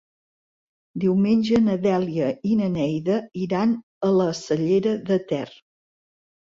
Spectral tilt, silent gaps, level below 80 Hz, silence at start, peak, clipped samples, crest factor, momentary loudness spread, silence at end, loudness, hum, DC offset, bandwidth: -7.5 dB/octave; 3.83-4.01 s; -60 dBFS; 0.95 s; -10 dBFS; under 0.1%; 14 dB; 7 LU; 1 s; -22 LUFS; none; under 0.1%; 7.6 kHz